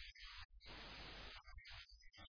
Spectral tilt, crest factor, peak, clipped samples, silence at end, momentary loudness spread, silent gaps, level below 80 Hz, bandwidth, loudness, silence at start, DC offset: -1 dB/octave; 14 dB; -44 dBFS; under 0.1%; 0 s; 4 LU; 0.45-0.49 s; -64 dBFS; 5.4 kHz; -56 LUFS; 0 s; under 0.1%